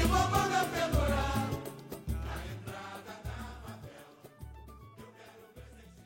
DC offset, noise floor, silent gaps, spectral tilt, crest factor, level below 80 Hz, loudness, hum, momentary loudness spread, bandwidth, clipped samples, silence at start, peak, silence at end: under 0.1%; -54 dBFS; none; -5 dB/octave; 22 dB; -42 dBFS; -34 LUFS; none; 24 LU; 16.5 kHz; under 0.1%; 0 s; -14 dBFS; 0 s